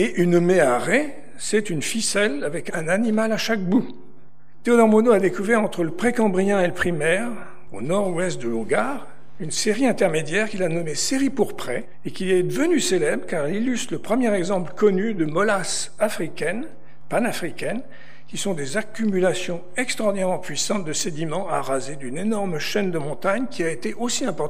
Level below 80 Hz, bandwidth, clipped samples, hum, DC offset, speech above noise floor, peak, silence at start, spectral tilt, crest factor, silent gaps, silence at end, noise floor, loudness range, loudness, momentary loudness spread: -60 dBFS; 15.5 kHz; under 0.1%; none; 4%; 30 dB; -2 dBFS; 0 s; -4.5 dB/octave; 18 dB; none; 0 s; -52 dBFS; 5 LU; -22 LUFS; 10 LU